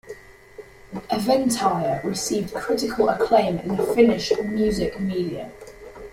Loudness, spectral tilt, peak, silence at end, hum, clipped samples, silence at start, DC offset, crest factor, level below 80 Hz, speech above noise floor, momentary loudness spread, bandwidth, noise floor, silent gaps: -22 LUFS; -5 dB/octave; -4 dBFS; 0 s; none; under 0.1%; 0.05 s; under 0.1%; 18 dB; -48 dBFS; 23 dB; 20 LU; 16 kHz; -44 dBFS; none